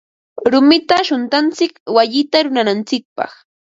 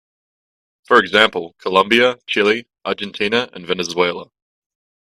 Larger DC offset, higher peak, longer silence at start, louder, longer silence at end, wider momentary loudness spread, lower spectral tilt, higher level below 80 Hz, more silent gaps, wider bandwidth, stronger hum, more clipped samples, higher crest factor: neither; about the same, 0 dBFS vs 0 dBFS; second, 0.35 s vs 0.9 s; first, -14 LUFS vs -17 LUFS; second, 0.4 s vs 0.85 s; first, 14 LU vs 11 LU; about the same, -4 dB/octave vs -3.5 dB/octave; about the same, -60 dBFS vs -60 dBFS; first, 1.80-1.86 s, 3.05-3.16 s vs none; second, 7.8 kHz vs 13.5 kHz; neither; neither; about the same, 16 dB vs 18 dB